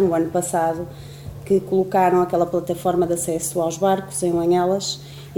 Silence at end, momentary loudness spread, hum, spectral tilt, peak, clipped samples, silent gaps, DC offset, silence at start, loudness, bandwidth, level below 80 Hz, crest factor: 0 s; 13 LU; none; -5 dB/octave; -6 dBFS; under 0.1%; none; under 0.1%; 0 s; -20 LUFS; 18 kHz; -50 dBFS; 14 dB